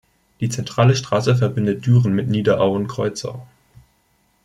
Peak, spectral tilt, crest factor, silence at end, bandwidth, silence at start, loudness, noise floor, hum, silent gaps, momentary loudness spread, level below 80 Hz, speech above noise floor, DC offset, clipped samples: -2 dBFS; -6.5 dB/octave; 16 dB; 1 s; 11 kHz; 0.4 s; -19 LUFS; -62 dBFS; none; none; 10 LU; -54 dBFS; 44 dB; under 0.1%; under 0.1%